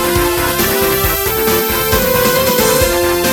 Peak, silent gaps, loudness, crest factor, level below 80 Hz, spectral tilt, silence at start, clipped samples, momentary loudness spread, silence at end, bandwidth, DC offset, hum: 0 dBFS; none; -12 LUFS; 14 dB; -28 dBFS; -3.5 dB/octave; 0 s; under 0.1%; 2 LU; 0 s; 19 kHz; under 0.1%; none